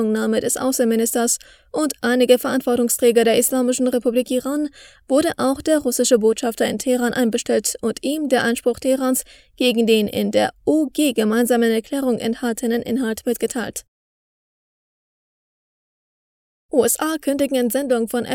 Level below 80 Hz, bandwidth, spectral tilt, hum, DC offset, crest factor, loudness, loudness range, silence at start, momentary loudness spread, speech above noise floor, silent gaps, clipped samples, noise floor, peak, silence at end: -56 dBFS; over 20 kHz; -3.5 dB/octave; none; under 0.1%; 18 dB; -19 LUFS; 8 LU; 0 s; 7 LU; over 71 dB; 13.88-16.69 s; under 0.1%; under -90 dBFS; -2 dBFS; 0 s